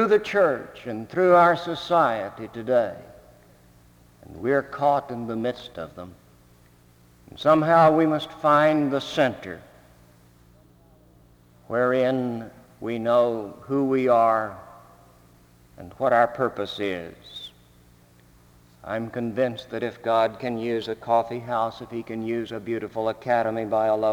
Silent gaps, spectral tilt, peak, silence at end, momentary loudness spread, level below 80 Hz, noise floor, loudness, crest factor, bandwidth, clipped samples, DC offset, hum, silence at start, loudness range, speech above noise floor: none; -6.5 dB/octave; -6 dBFS; 0 s; 18 LU; -60 dBFS; -55 dBFS; -23 LUFS; 20 dB; 19 kHz; under 0.1%; under 0.1%; none; 0 s; 8 LU; 32 dB